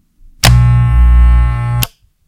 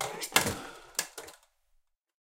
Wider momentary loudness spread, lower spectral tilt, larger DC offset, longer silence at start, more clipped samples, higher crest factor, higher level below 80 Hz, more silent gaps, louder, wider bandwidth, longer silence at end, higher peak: second, 8 LU vs 19 LU; first, -5 dB/octave vs -1.5 dB/octave; neither; first, 0.45 s vs 0 s; first, 0.3% vs under 0.1%; second, 10 dB vs 32 dB; first, -12 dBFS vs -62 dBFS; neither; first, -11 LUFS vs -31 LUFS; about the same, 17 kHz vs 17 kHz; second, 0.4 s vs 0.95 s; first, 0 dBFS vs -4 dBFS